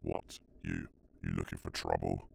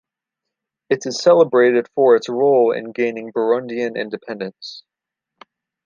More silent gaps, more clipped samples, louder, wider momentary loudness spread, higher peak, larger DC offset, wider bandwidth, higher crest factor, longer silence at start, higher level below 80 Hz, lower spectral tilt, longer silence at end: neither; neither; second, -39 LUFS vs -17 LUFS; second, 11 LU vs 15 LU; second, -16 dBFS vs -2 dBFS; neither; first, over 20 kHz vs 7.4 kHz; first, 22 dB vs 16 dB; second, 0 s vs 0.9 s; first, -52 dBFS vs -74 dBFS; about the same, -6 dB/octave vs -5 dB/octave; second, 0 s vs 1.05 s